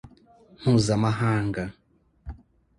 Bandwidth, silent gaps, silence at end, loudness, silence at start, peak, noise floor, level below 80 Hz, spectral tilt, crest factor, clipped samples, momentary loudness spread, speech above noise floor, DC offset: 11.5 kHz; none; 0.45 s; -24 LUFS; 0.05 s; -10 dBFS; -55 dBFS; -48 dBFS; -6.5 dB/octave; 18 dB; under 0.1%; 23 LU; 32 dB; under 0.1%